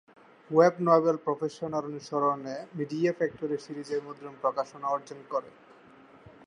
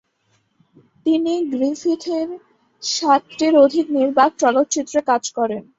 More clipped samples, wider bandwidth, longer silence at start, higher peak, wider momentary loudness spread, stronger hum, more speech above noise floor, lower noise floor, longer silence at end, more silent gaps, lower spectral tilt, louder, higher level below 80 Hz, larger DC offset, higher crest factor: neither; first, 10.5 kHz vs 8 kHz; second, 0.5 s vs 1.05 s; second, -8 dBFS vs -2 dBFS; about the same, 12 LU vs 10 LU; neither; second, 26 dB vs 47 dB; second, -55 dBFS vs -65 dBFS; first, 1 s vs 0.15 s; neither; first, -7 dB/octave vs -3 dB/octave; second, -29 LUFS vs -18 LUFS; second, -74 dBFS vs -64 dBFS; neither; first, 22 dB vs 16 dB